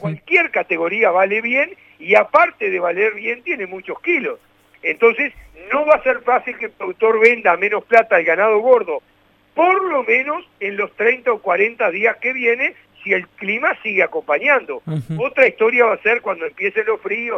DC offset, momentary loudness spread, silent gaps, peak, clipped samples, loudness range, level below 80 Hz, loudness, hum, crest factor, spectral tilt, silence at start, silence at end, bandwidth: under 0.1%; 11 LU; none; 0 dBFS; under 0.1%; 3 LU; -60 dBFS; -17 LUFS; none; 18 dB; -6.5 dB/octave; 0 s; 0 s; 7.2 kHz